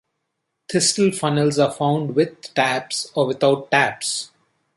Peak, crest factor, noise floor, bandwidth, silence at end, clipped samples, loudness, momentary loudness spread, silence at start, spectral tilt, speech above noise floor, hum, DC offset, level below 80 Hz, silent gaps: -2 dBFS; 18 dB; -76 dBFS; 11.5 kHz; 0.5 s; under 0.1%; -20 LUFS; 7 LU; 0.7 s; -4 dB/octave; 57 dB; none; under 0.1%; -64 dBFS; none